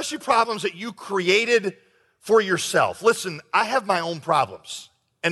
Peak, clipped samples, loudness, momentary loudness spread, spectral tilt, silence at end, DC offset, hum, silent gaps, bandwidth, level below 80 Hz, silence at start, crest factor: -6 dBFS; under 0.1%; -22 LUFS; 14 LU; -3 dB/octave; 0 s; under 0.1%; none; none; 12 kHz; -70 dBFS; 0 s; 18 dB